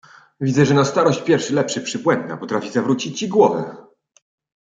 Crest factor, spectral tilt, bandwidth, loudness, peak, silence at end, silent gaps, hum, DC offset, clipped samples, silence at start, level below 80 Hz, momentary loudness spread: 18 dB; -5.5 dB/octave; 9.2 kHz; -19 LUFS; -2 dBFS; 0.9 s; none; none; under 0.1%; under 0.1%; 0.4 s; -64 dBFS; 9 LU